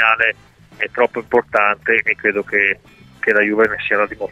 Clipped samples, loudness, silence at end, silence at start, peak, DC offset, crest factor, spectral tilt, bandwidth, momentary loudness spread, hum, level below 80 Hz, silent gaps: under 0.1%; -16 LUFS; 0 s; 0 s; 0 dBFS; under 0.1%; 16 dB; -5.5 dB/octave; 8.4 kHz; 8 LU; none; -54 dBFS; none